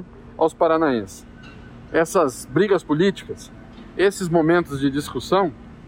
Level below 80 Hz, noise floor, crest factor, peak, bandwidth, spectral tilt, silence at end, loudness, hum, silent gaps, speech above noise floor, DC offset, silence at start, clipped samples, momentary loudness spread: -48 dBFS; -41 dBFS; 16 dB; -6 dBFS; 16 kHz; -5.5 dB/octave; 0.05 s; -20 LUFS; none; none; 21 dB; under 0.1%; 0 s; under 0.1%; 19 LU